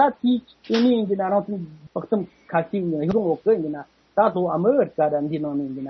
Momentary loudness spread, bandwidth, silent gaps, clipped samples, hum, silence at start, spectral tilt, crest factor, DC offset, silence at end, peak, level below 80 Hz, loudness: 10 LU; 6.4 kHz; none; under 0.1%; none; 0 s; -8 dB/octave; 16 dB; under 0.1%; 0 s; -6 dBFS; -60 dBFS; -22 LUFS